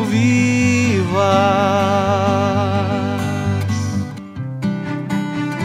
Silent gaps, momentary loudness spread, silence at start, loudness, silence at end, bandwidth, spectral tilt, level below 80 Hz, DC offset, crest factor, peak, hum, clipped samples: none; 9 LU; 0 s; -17 LUFS; 0 s; 14 kHz; -6 dB/octave; -50 dBFS; under 0.1%; 16 dB; -2 dBFS; none; under 0.1%